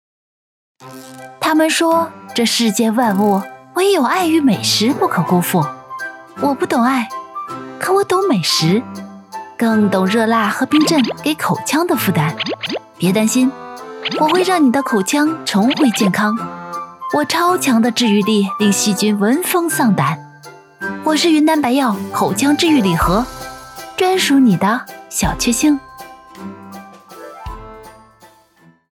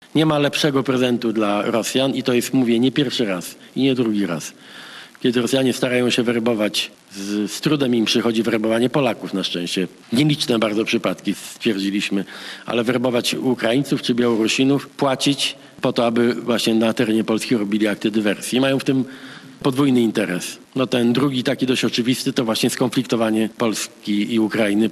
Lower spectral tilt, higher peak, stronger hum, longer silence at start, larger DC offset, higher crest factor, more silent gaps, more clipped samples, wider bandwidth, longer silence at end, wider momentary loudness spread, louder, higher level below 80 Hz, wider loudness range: about the same, -4.5 dB/octave vs -4.5 dB/octave; first, 0 dBFS vs -4 dBFS; neither; first, 0.8 s vs 0.15 s; neither; about the same, 16 dB vs 14 dB; neither; neither; first, 19 kHz vs 13.5 kHz; first, 1 s vs 0 s; first, 18 LU vs 7 LU; first, -15 LUFS vs -20 LUFS; first, -42 dBFS vs -62 dBFS; about the same, 3 LU vs 2 LU